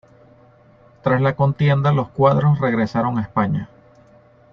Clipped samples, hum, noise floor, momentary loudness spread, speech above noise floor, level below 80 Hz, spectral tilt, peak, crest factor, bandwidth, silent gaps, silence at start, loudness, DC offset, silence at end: under 0.1%; none; -50 dBFS; 7 LU; 33 dB; -52 dBFS; -9.5 dB/octave; -2 dBFS; 18 dB; 6.2 kHz; none; 1.05 s; -19 LUFS; under 0.1%; 0.85 s